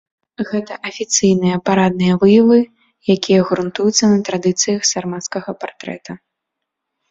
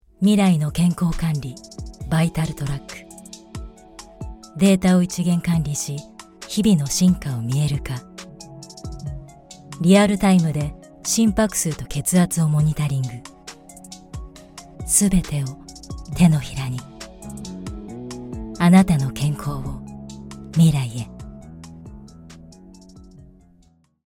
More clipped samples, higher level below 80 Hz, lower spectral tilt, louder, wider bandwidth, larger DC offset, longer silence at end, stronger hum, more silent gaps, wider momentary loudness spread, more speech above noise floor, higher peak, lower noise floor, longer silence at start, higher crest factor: neither; second, -56 dBFS vs -40 dBFS; about the same, -4.5 dB/octave vs -5.5 dB/octave; first, -15 LUFS vs -20 LUFS; second, 7.8 kHz vs 17 kHz; neither; about the same, 0.95 s vs 1.05 s; neither; neither; second, 16 LU vs 23 LU; first, 63 dB vs 38 dB; about the same, 0 dBFS vs -2 dBFS; first, -79 dBFS vs -57 dBFS; first, 0.4 s vs 0.2 s; about the same, 16 dB vs 20 dB